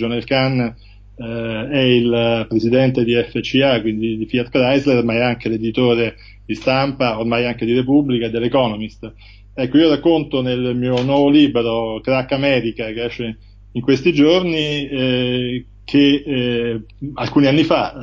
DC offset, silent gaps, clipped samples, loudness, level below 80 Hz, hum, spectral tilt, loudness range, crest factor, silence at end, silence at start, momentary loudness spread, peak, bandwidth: under 0.1%; none; under 0.1%; -17 LUFS; -42 dBFS; none; -7 dB/octave; 2 LU; 14 dB; 0 s; 0 s; 11 LU; -2 dBFS; 7.4 kHz